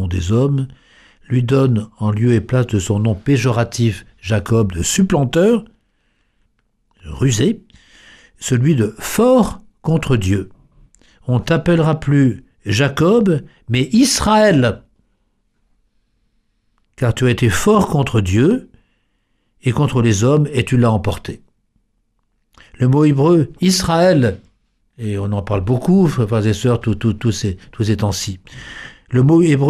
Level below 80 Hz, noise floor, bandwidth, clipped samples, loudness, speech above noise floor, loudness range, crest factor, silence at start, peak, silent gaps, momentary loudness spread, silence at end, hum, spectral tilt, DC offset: -40 dBFS; -65 dBFS; 14.5 kHz; under 0.1%; -16 LUFS; 50 dB; 3 LU; 14 dB; 0 s; -2 dBFS; none; 11 LU; 0 s; none; -6 dB/octave; under 0.1%